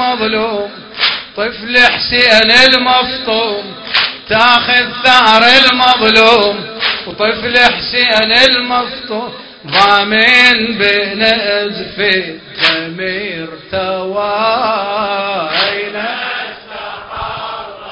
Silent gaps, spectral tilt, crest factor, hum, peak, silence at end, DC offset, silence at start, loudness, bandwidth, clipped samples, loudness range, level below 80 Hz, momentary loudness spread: none; -3 dB/octave; 12 dB; none; 0 dBFS; 0 s; under 0.1%; 0 s; -10 LUFS; 8 kHz; 0.7%; 8 LU; -44 dBFS; 16 LU